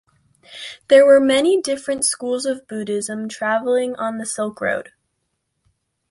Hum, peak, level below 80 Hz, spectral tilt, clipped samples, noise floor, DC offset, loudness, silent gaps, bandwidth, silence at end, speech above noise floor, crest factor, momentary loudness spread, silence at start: none; -2 dBFS; -64 dBFS; -3 dB/octave; under 0.1%; -73 dBFS; under 0.1%; -18 LUFS; none; 11.5 kHz; 1.3 s; 55 dB; 18 dB; 14 LU; 0.5 s